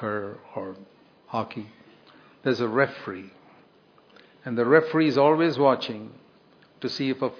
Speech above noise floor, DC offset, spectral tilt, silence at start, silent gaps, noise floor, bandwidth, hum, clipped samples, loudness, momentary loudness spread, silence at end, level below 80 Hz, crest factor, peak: 33 dB; under 0.1%; -7 dB/octave; 0 s; none; -57 dBFS; 5.4 kHz; none; under 0.1%; -24 LUFS; 20 LU; 0.05 s; -76 dBFS; 24 dB; -2 dBFS